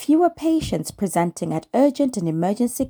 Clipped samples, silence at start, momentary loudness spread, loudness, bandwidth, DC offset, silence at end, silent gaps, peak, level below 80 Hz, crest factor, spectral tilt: under 0.1%; 0 s; 6 LU; -21 LUFS; over 20 kHz; under 0.1%; 0 s; none; -6 dBFS; -50 dBFS; 14 dB; -6 dB/octave